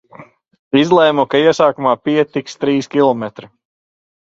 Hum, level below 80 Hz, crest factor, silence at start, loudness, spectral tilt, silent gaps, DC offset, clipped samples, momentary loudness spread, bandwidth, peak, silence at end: none; -58 dBFS; 16 dB; 0.2 s; -14 LUFS; -5.5 dB/octave; 0.59-0.71 s; under 0.1%; under 0.1%; 8 LU; 7.8 kHz; 0 dBFS; 0.9 s